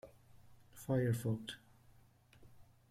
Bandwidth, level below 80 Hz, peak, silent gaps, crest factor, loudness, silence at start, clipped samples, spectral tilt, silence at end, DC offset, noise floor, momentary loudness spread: 15.5 kHz; -70 dBFS; -24 dBFS; none; 18 dB; -39 LUFS; 0.05 s; under 0.1%; -6.5 dB/octave; 0.3 s; under 0.1%; -66 dBFS; 24 LU